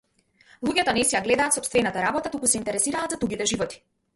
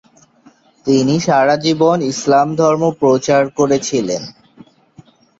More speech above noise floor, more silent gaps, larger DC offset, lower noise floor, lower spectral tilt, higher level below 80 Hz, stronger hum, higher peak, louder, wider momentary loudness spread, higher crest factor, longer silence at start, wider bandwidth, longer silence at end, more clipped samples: about the same, 35 dB vs 36 dB; neither; neither; first, -59 dBFS vs -49 dBFS; second, -2.5 dB/octave vs -5 dB/octave; about the same, -54 dBFS vs -56 dBFS; neither; about the same, -4 dBFS vs -2 dBFS; second, -23 LUFS vs -14 LUFS; about the same, 6 LU vs 7 LU; first, 20 dB vs 14 dB; second, 0.6 s vs 0.85 s; first, 12 kHz vs 8 kHz; second, 0.4 s vs 1.1 s; neither